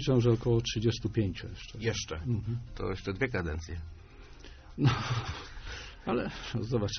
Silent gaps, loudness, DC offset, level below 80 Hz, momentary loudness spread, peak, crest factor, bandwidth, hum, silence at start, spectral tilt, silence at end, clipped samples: none; -32 LUFS; under 0.1%; -46 dBFS; 15 LU; -14 dBFS; 18 dB; 6.6 kHz; none; 0 s; -5.5 dB/octave; 0 s; under 0.1%